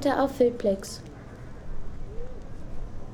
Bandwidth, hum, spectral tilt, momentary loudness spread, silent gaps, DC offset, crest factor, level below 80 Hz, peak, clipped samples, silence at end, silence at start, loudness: 17.5 kHz; none; -6 dB/octave; 20 LU; none; under 0.1%; 18 dB; -40 dBFS; -10 dBFS; under 0.1%; 0 s; 0 s; -26 LUFS